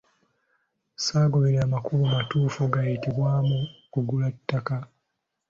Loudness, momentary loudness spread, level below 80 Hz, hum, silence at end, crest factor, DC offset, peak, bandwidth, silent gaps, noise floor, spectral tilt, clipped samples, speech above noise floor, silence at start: -25 LUFS; 8 LU; -56 dBFS; none; 0.65 s; 18 dB; under 0.1%; -8 dBFS; 7.6 kHz; none; -80 dBFS; -6.5 dB/octave; under 0.1%; 56 dB; 1 s